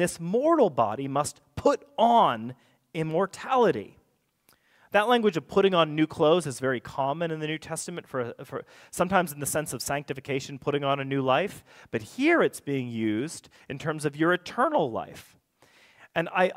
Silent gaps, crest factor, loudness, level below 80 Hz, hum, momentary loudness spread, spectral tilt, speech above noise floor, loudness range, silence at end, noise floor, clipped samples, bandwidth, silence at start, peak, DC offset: none; 20 dB; -26 LUFS; -62 dBFS; none; 13 LU; -5 dB/octave; 42 dB; 5 LU; 0.05 s; -68 dBFS; under 0.1%; 16 kHz; 0 s; -6 dBFS; under 0.1%